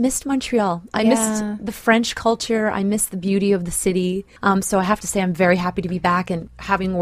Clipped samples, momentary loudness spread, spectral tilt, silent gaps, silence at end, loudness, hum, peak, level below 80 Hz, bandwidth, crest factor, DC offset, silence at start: under 0.1%; 6 LU; -4.5 dB/octave; none; 0 s; -20 LUFS; none; -2 dBFS; -44 dBFS; 15.5 kHz; 18 dB; under 0.1%; 0 s